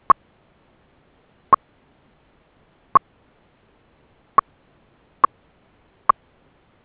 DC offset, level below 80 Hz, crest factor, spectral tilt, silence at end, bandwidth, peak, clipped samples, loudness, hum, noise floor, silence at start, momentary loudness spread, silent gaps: under 0.1%; -58 dBFS; 24 dB; -4 dB/octave; 3.85 s; 4 kHz; 0 dBFS; under 0.1%; -21 LUFS; none; -59 dBFS; 1.5 s; 2 LU; none